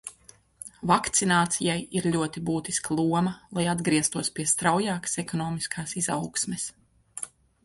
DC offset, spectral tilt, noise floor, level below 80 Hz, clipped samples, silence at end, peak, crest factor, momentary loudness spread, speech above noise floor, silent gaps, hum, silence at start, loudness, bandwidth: under 0.1%; -3.5 dB/octave; -56 dBFS; -58 dBFS; under 0.1%; 0.4 s; -8 dBFS; 20 dB; 15 LU; 29 dB; none; none; 0.05 s; -26 LUFS; 12 kHz